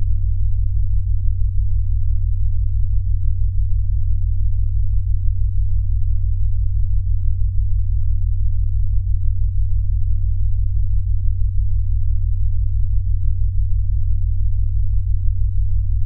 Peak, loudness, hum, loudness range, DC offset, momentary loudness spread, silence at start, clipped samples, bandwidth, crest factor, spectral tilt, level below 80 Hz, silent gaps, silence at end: -4 dBFS; -22 LUFS; none; 0 LU; under 0.1%; 1 LU; 0 s; under 0.1%; 0.2 kHz; 12 dB; -13 dB/octave; -18 dBFS; none; 0 s